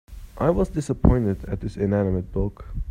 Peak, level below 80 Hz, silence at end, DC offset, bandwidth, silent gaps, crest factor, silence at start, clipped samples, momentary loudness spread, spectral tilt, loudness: -2 dBFS; -30 dBFS; 0 s; under 0.1%; 13 kHz; none; 22 dB; 0.1 s; under 0.1%; 10 LU; -9 dB/octave; -24 LUFS